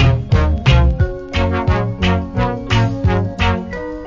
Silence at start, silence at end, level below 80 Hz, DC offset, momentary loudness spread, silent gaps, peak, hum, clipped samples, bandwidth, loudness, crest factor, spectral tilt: 0 s; 0 s; -20 dBFS; under 0.1%; 6 LU; none; 0 dBFS; none; under 0.1%; 7.6 kHz; -17 LUFS; 16 dB; -7 dB/octave